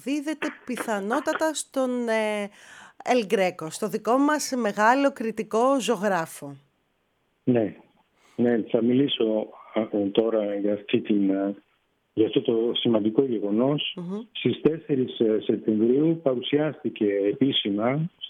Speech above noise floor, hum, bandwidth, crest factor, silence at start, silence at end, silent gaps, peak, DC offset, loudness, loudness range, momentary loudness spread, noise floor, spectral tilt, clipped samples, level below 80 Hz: 47 dB; none; 16 kHz; 18 dB; 0.05 s; 0 s; none; -6 dBFS; under 0.1%; -25 LUFS; 3 LU; 9 LU; -71 dBFS; -5 dB/octave; under 0.1%; -72 dBFS